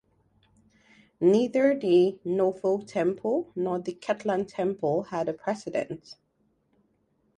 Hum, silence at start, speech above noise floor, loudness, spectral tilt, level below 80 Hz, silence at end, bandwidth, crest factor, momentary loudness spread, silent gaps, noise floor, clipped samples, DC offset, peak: none; 1.2 s; 45 dB; -27 LUFS; -7 dB/octave; -70 dBFS; 1.25 s; 9.8 kHz; 18 dB; 10 LU; none; -71 dBFS; under 0.1%; under 0.1%; -10 dBFS